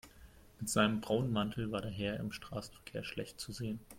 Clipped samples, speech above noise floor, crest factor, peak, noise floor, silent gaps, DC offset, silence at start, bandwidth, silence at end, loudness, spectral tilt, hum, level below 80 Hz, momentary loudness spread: under 0.1%; 21 dB; 20 dB; -18 dBFS; -59 dBFS; none; under 0.1%; 0.05 s; 16.5 kHz; 0 s; -37 LUFS; -5 dB/octave; none; -60 dBFS; 12 LU